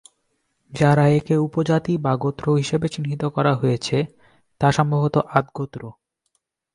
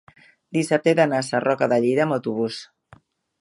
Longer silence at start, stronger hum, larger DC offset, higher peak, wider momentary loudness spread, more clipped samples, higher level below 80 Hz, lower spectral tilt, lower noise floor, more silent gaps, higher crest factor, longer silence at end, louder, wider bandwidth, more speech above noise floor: first, 0.7 s vs 0.5 s; neither; neither; first, 0 dBFS vs -4 dBFS; first, 13 LU vs 9 LU; neither; first, -54 dBFS vs -70 dBFS; first, -7 dB/octave vs -5.5 dB/octave; first, -72 dBFS vs -54 dBFS; neither; about the same, 20 dB vs 18 dB; about the same, 0.85 s vs 0.75 s; about the same, -21 LUFS vs -21 LUFS; about the same, 11 kHz vs 11.5 kHz; first, 53 dB vs 33 dB